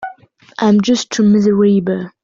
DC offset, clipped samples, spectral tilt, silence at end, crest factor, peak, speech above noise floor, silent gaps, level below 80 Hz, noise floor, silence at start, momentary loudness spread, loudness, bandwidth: under 0.1%; under 0.1%; -6 dB/octave; 0.15 s; 10 dB; -4 dBFS; 28 dB; none; -54 dBFS; -41 dBFS; 0 s; 12 LU; -13 LUFS; 7.6 kHz